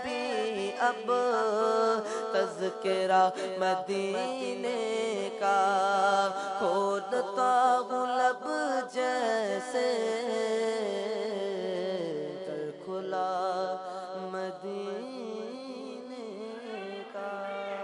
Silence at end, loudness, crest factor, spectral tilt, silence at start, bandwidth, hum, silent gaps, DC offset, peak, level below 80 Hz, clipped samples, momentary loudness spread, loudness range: 0 s; -30 LUFS; 18 dB; -4 dB/octave; 0 s; 11 kHz; none; none; under 0.1%; -14 dBFS; -82 dBFS; under 0.1%; 13 LU; 9 LU